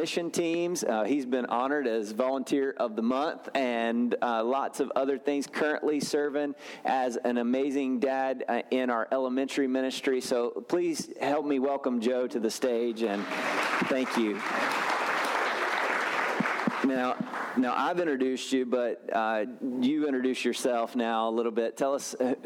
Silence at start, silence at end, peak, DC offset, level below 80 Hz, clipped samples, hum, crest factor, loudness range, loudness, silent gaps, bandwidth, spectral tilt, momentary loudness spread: 0 s; 0 s; -14 dBFS; under 0.1%; -82 dBFS; under 0.1%; none; 14 dB; 1 LU; -29 LUFS; none; 16.5 kHz; -4 dB/octave; 3 LU